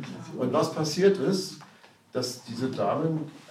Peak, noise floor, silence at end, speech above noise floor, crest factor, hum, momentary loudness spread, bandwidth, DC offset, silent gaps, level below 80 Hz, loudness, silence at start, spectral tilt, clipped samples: -10 dBFS; -55 dBFS; 0.05 s; 28 dB; 18 dB; none; 13 LU; 14.5 kHz; under 0.1%; none; -76 dBFS; -28 LUFS; 0 s; -5.5 dB/octave; under 0.1%